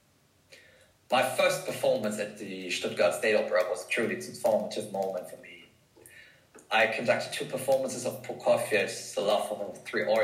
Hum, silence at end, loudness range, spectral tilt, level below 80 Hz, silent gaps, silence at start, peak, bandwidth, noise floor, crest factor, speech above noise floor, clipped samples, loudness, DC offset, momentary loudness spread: none; 0 s; 3 LU; -3 dB/octave; -76 dBFS; none; 0.5 s; -12 dBFS; 16 kHz; -65 dBFS; 18 dB; 37 dB; under 0.1%; -29 LUFS; under 0.1%; 10 LU